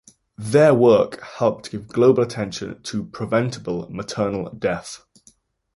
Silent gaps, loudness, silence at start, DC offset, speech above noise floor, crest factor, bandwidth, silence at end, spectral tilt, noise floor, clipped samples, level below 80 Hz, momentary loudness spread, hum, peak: none; -20 LUFS; 0.4 s; under 0.1%; 37 dB; 18 dB; 11.5 kHz; 0.8 s; -6 dB/octave; -57 dBFS; under 0.1%; -54 dBFS; 15 LU; none; -2 dBFS